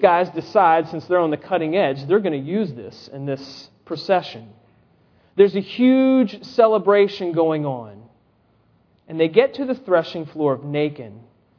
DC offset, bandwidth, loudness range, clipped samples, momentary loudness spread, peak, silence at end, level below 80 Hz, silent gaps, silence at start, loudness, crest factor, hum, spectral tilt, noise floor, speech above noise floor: under 0.1%; 5.4 kHz; 6 LU; under 0.1%; 18 LU; 0 dBFS; 0.4 s; -68 dBFS; none; 0 s; -19 LUFS; 20 dB; none; -7.5 dB/octave; -60 dBFS; 41 dB